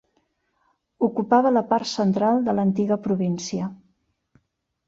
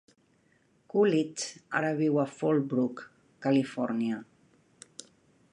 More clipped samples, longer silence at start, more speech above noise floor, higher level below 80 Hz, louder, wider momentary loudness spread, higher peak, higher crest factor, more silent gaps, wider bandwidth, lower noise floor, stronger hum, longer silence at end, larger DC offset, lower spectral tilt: neither; about the same, 1 s vs 0.95 s; first, 51 dB vs 39 dB; first, -64 dBFS vs -78 dBFS; first, -22 LUFS vs -29 LUFS; second, 9 LU vs 20 LU; first, -6 dBFS vs -14 dBFS; about the same, 18 dB vs 16 dB; neither; second, 7.8 kHz vs 10.5 kHz; first, -72 dBFS vs -67 dBFS; neither; second, 1.15 s vs 1.3 s; neither; about the same, -6.5 dB/octave vs -6 dB/octave